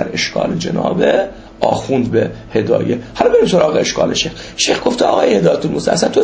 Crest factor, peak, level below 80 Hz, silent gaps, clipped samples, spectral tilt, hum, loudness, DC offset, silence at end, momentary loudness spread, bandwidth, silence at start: 14 dB; 0 dBFS; -42 dBFS; none; under 0.1%; -4.5 dB/octave; none; -15 LUFS; under 0.1%; 0 s; 6 LU; 8 kHz; 0 s